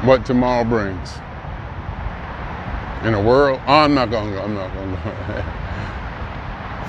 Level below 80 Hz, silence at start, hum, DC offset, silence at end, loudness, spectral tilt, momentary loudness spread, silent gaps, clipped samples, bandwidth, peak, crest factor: -34 dBFS; 0 s; none; under 0.1%; 0 s; -20 LUFS; -7 dB/octave; 16 LU; none; under 0.1%; 9 kHz; 0 dBFS; 20 dB